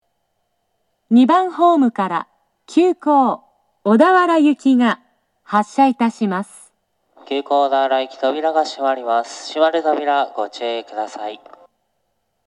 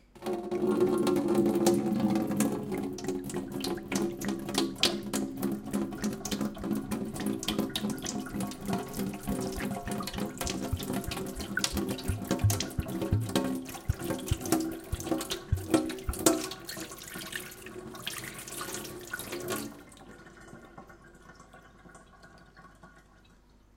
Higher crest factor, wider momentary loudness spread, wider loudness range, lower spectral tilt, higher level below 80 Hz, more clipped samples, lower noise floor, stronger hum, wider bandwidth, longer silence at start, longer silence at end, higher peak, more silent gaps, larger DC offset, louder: second, 18 dB vs 26 dB; about the same, 13 LU vs 12 LU; second, 4 LU vs 11 LU; about the same, -5.5 dB/octave vs -4.5 dB/octave; second, -80 dBFS vs -48 dBFS; neither; first, -71 dBFS vs -59 dBFS; neither; second, 11.5 kHz vs 17 kHz; first, 1.1 s vs 0.15 s; first, 1.1 s vs 0.75 s; first, 0 dBFS vs -6 dBFS; neither; neither; first, -17 LUFS vs -32 LUFS